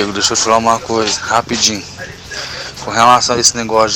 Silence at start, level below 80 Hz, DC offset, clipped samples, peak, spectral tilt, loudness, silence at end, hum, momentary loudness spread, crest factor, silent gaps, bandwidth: 0 s; -44 dBFS; under 0.1%; under 0.1%; 0 dBFS; -2 dB/octave; -12 LUFS; 0 s; none; 15 LU; 14 dB; none; 16.5 kHz